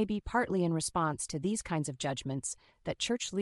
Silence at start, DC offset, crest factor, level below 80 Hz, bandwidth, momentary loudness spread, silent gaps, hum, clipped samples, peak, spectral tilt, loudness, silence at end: 0 s; under 0.1%; 16 dB; -54 dBFS; 12 kHz; 7 LU; none; none; under 0.1%; -16 dBFS; -4.5 dB/octave; -34 LUFS; 0 s